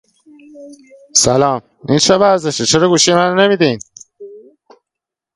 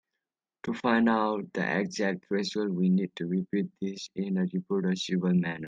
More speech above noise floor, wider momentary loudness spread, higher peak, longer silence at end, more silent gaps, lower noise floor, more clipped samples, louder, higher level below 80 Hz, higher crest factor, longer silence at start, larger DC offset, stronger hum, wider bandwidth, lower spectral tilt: first, 71 dB vs 59 dB; about the same, 7 LU vs 9 LU; first, 0 dBFS vs -12 dBFS; first, 1 s vs 0 s; neither; second, -84 dBFS vs -88 dBFS; neither; first, -12 LUFS vs -29 LUFS; first, -48 dBFS vs -72 dBFS; about the same, 16 dB vs 18 dB; about the same, 0.55 s vs 0.65 s; neither; neither; first, 11.5 kHz vs 7.6 kHz; second, -3.5 dB/octave vs -6.5 dB/octave